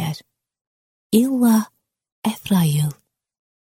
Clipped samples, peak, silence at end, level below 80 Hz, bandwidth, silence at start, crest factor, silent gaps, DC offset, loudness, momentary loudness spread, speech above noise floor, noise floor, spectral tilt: under 0.1%; -4 dBFS; 0.8 s; -60 dBFS; 16.5 kHz; 0 s; 18 dB; 0.61-1.10 s, 2.12-2.22 s; under 0.1%; -19 LUFS; 12 LU; 24 dB; -41 dBFS; -6 dB/octave